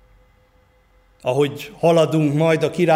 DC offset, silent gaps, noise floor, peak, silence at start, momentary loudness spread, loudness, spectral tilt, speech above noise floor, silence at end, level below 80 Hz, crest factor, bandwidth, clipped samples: under 0.1%; none; -56 dBFS; -4 dBFS; 1.25 s; 7 LU; -19 LUFS; -6.5 dB/octave; 39 dB; 0 s; -58 dBFS; 16 dB; 16 kHz; under 0.1%